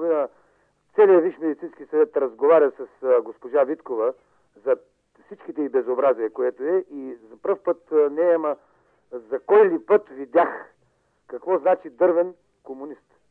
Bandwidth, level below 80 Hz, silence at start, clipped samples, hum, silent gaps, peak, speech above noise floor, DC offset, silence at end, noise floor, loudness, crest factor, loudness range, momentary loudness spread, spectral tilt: 3.7 kHz; -76 dBFS; 0 s; under 0.1%; none; none; -6 dBFS; 44 dB; under 0.1%; 0.35 s; -66 dBFS; -22 LUFS; 16 dB; 5 LU; 19 LU; -8.5 dB/octave